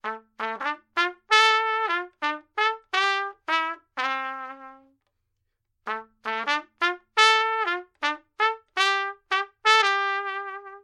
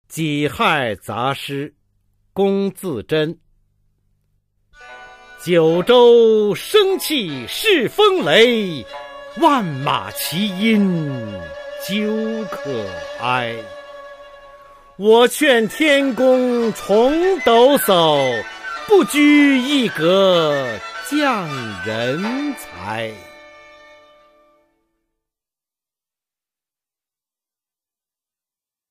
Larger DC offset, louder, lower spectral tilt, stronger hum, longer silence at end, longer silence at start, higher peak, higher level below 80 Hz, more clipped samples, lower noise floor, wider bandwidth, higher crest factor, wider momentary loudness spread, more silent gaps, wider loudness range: neither; second, -24 LUFS vs -16 LUFS; second, 0.5 dB/octave vs -4.5 dB/octave; neither; second, 0.05 s vs 5.6 s; about the same, 0.05 s vs 0.1 s; about the same, -2 dBFS vs -2 dBFS; second, -76 dBFS vs -54 dBFS; neither; second, -77 dBFS vs under -90 dBFS; second, 13 kHz vs 15.5 kHz; first, 24 dB vs 16 dB; about the same, 15 LU vs 16 LU; neither; about the same, 8 LU vs 10 LU